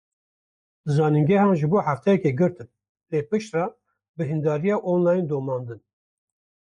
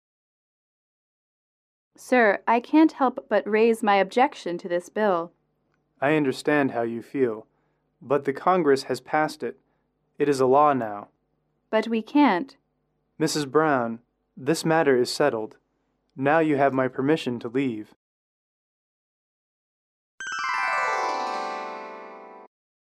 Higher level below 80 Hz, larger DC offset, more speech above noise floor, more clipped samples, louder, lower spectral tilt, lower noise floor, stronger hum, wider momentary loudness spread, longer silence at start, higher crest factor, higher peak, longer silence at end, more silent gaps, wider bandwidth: first, -64 dBFS vs -74 dBFS; neither; first, over 68 dB vs 50 dB; neither; about the same, -23 LUFS vs -23 LUFS; first, -8.5 dB/octave vs -5.5 dB/octave; first, under -90 dBFS vs -73 dBFS; neither; about the same, 12 LU vs 14 LU; second, 0.85 s vs 2 s; about the same, 14 dB vs 18 dB; about the same, -10 dBFS vs -8 dBFS; first, 0.85 s vs 0.5 s; second, 2.89-2.95 s, 4.09-4.14 s vs 17.96-20.18 s; second, 9.4 kHz vs 14 kHz